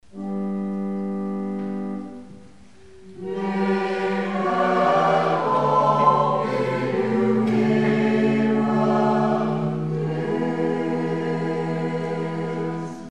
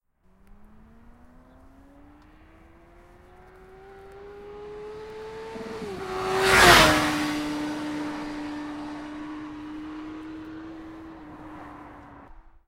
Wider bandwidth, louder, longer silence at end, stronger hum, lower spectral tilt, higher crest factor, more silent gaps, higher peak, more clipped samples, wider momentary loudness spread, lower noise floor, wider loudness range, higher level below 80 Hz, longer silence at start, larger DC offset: second, 9.6 kHz vs 16 kHz; about the same, -22 LUFS vs -22 LUFS; second, 0 s vs 0.2 s; neither; first, -7.5 dB/octave vs -3 dB/octave; second, 18 dB vs 28 dB; neither; about the same, -4 dBFS vs -2 dBFS; neither; second, 10 LU vs 27 LU; second, -49 dBFS vs -58 dBFS; second, 8 LU vs 21 LU; second, -62 dBFS vs -46 dBFS; second, 0.15 s vs 0.5 s; first, 0.4% vs under 0.1%